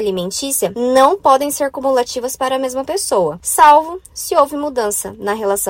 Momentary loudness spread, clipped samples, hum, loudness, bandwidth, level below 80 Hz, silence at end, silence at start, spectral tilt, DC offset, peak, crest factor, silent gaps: 10 LU; 0.1%; none; -15 LUFS; 16.5 kHz; -50 dBFS; 0 s; 0 s; -2.5 dB/octave; under 0.1%; 0 dBFS; 16 dB; none